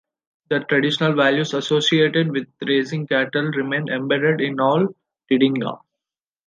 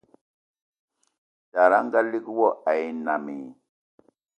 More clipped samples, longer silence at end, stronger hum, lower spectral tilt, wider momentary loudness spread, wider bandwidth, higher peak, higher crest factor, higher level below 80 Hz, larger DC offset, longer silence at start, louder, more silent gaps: neither; second, 0.7 s vs 0.85 s; neither; about the same, -5.5 dB/octave vs -6.5 dB/octave; second, 8 LU vs 16 LU; about the same, 9.4 kHz vs 8.8 kHz; about the same, -4 dBFS vs -4 dBFS; second, 16 dB vs 22 dB; first, -70 dBFS vs -78 dBFS; neither; second, 0.5 s vs 1.55 s; first, -20 LUFS vs -23 LUFS; neither